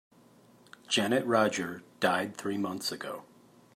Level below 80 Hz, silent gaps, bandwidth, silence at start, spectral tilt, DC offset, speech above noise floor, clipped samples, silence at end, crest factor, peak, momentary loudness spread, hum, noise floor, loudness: -78 dBFS; none; 16 kHz; 0.9 s; -3.5 dB/octave; under 0.1%; 29 dB; under 0.1%; 0.5 s; 20 dB; -12 dBFS; 13 LU; none; -59 dBFS; -30 LUFS